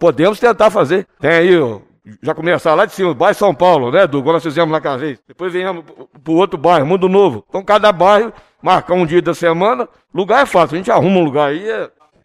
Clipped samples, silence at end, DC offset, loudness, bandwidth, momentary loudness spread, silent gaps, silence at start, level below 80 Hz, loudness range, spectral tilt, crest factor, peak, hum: under 0.1%; 0.35 s; under 0.1%; -13 LUFS; 14 kHz; 12 LU; none; 0 s; -52 dBFS; 2 LU; -6 dB/octave; 12 dB; 0 dBFS; none